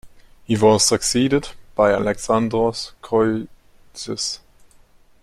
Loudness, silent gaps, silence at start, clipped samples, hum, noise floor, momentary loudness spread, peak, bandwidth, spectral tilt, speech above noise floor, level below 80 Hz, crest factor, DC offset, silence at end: -19 LUFS; none; 0.05 s; under 0.1%; none; -51 dBFS; 15 LU; -2 dBFS; 15 kHz; -4 dB/octave; 32 dB; -46 dBFS; 18 dB; under 0.1%; 0.85 s